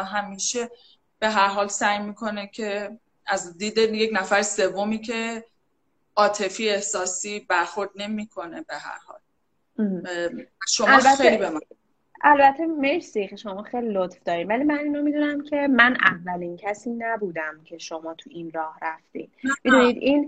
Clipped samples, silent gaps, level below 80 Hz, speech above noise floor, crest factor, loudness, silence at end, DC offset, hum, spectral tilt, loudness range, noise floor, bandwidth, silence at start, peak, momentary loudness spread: under 0.1%; none; -62 dBFS; 51 dB; 24 dB; -22 LUFS; 0 s; under 0.1%; none; -3 dB/octave; 9 LU; -74 dBFS; 9.4 kHz; 0 s; 0 dBFS; 18 LU